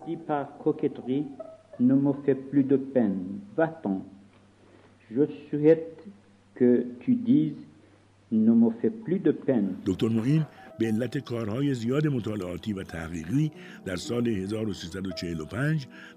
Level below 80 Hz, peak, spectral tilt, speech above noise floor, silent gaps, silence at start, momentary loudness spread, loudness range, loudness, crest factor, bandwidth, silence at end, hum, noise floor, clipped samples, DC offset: -64 dBFS; -8 dBFS; -8 dB/octave; 31 dB; none; 0 s; 12 LU; 4 LU; -27 LUFS; 20 dB; 11.5 kHz; 0.05 s; none; -58 dBFS; under 0.1%; under 0.1%